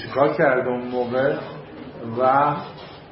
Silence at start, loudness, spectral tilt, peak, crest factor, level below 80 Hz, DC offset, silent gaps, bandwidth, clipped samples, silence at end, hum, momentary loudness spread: 0 s; -21 LUFS; -11 dB/octave; -4 dBFS; 18 dB; -58 dBFS; under 0.1%; none; 5.8 kHz; under 0.1%; 0 s; none; 19 LU